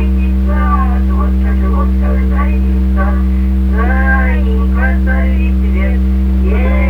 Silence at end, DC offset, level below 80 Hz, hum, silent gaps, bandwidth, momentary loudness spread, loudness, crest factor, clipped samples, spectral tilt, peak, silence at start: 0 s; under 0.1%; -12 dBFS; none; none; 3.6 kHz; 1 LU; -13 LUFS; 10 dB; under 0.1%; -9.5 dB/octave; 0 dBFS; 0 s